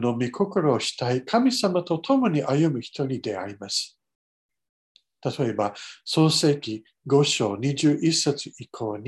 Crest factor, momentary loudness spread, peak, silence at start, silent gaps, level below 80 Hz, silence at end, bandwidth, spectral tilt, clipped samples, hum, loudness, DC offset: 18 dB; 12 LU; -8 dBFS; 0 s; 4.15-4.49 s, 4.69-4.95 s; -66 dBFS; 0 s; 12.5 kHz; -5 dB/octave; under 0.1%; none; -24 LUFS; under 0.1%